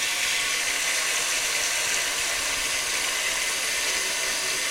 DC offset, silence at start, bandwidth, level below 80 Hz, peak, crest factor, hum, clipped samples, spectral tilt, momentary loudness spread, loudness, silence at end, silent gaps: under 0.1%; 0 s; 16 kHz; -54 dBFS; -8 dBFS; 18 dB; none; under 0.1%; 2 dB/octave; 1 LU; -23 LUFS; 0 s; none